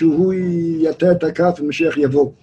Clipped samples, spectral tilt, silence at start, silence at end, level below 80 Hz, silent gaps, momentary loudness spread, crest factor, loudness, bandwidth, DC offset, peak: under 0.1%; -8 dB/octave; 0 s; 0.1 s; -54 dBFS; none; 3 LU; 14 dB; -17 LUFS; 8.2 kHz; under 0.1%; -2 dBFS